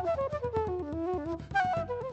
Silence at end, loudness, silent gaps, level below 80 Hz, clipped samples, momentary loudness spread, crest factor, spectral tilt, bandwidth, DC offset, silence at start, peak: 0 s; -32 LUFS; none; -50 dBFS; under 0.1%; 4 LU; 14 dB; -7 dB/octave; 8.2 kHz; under 0.1%; 0 s; -18 dBFS